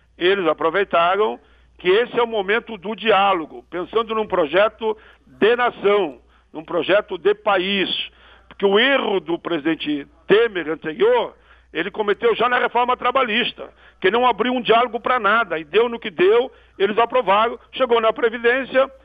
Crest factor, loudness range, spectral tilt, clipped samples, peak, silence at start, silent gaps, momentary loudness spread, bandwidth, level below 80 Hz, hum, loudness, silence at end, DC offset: 18 dB; 2 LU; -7 dB/octave; under 0.1%; -2 dBFS; 0.2 s; none; 10 LU; 5 kHz; -56 dBFS; none; -19 LUFS; 0.15 s; under 0.1%